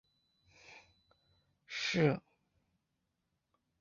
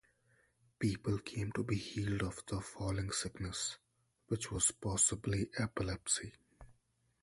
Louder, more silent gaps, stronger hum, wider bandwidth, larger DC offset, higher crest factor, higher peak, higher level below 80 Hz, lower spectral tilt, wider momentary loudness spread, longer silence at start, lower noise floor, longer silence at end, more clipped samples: about the same, -35 LUFS vs -37 LUFS; neither; neither; second, 7.4 kHz vs 11.5 kHz; neither; about the same, 24 dB vs 22 dB; about the same, -18 dBFS vs -18 dBFS; second, -74 dBFS vs -56 dBFS; about the same, -4.5 dB/octave vs -4 dB/octave; first, 25 LU vs 10 LU; about the same, 0.7 s vs 0.8 s; first, -84 dBFS vs -77 dBFS; first, 1.6 s vs 0.5 s; neither